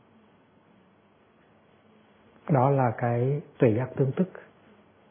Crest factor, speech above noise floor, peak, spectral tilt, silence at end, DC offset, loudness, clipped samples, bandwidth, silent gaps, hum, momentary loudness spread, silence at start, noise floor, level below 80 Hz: 22 dB; 36 dB; -6 dBFS; -12.5 dB/octave; 0.7 s; under 0.1%; -26 LUFS; under 0.1%; 3.6 kHz; none; none; 8 LU; 2.45 s; -61 dBFS; -68 dBFS